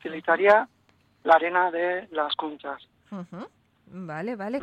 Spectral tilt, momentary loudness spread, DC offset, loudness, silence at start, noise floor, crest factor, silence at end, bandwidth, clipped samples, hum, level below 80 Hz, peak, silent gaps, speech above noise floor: -6 dB/octave; 22 LU; under 0.1%; -24 LUFS; 0.05 s; -64 dBFS; 20 dB; 0 s; 8.4 kHz; under 0.1%; none; -70 dBFS; -6 dBFS; none; 39 dB